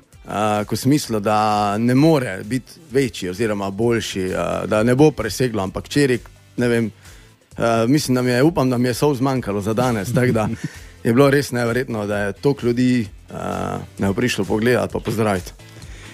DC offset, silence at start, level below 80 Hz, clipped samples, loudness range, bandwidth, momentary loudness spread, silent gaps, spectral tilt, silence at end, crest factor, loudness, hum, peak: under 0.1%; 0.25 s; -44 dBFS; under 0.1%; 2 LU; 15.5 kHz; 10 LU; none; -6 dB/octave; 0 s; 18 dB; -19 LUFS; none; -2 dBFS